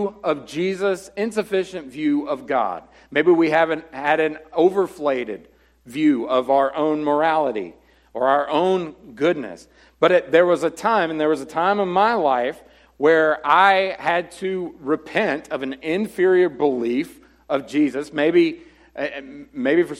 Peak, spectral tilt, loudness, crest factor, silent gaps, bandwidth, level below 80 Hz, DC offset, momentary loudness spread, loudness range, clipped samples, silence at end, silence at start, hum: -2 dBFS; -5.5 dB/octave; -20 LUFS; 18 dB; none; 13 kHz; -60 dBFS; under 0.1%; 12 LU; 3 LU; under 0.1%; 0 s; 0 s; none